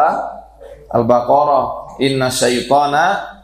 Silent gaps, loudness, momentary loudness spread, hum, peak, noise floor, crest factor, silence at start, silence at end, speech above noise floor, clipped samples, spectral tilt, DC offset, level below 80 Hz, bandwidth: none; -15 LUFS; 11 LU; none; 0 dBFS; -38 dBFS; 14 dB; 0 s; 0.1 s; 23 dB; under 0.1%; -4 dB/octave; under 0.1%; -46 dBFS; 15.5 kHz